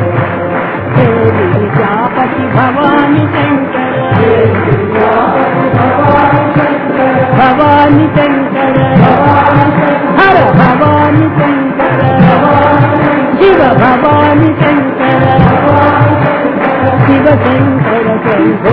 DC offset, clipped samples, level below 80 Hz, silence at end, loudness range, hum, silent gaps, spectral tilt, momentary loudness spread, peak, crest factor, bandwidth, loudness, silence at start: under 0.1%; 1%; -34 dBFS; 0 s; 3 LU; none; none; -10.5 dB/octave; 5 LU; 0 dBFS; 8 dB; 5.4 kHz; -8 LUFS; 0 s